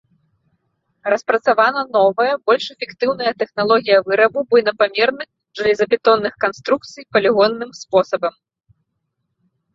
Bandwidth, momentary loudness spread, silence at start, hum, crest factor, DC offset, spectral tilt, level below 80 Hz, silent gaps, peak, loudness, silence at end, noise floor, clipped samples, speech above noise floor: 7.6 kHz; 8 LU; 1.05 s; none; 16 dB; under 0.1%; -4.5 dB/octave; -62 dBFS; none; -2 dBFS; -17 LUFS; 1.45 s; -73 dBFS; under 0.1%; 57 dB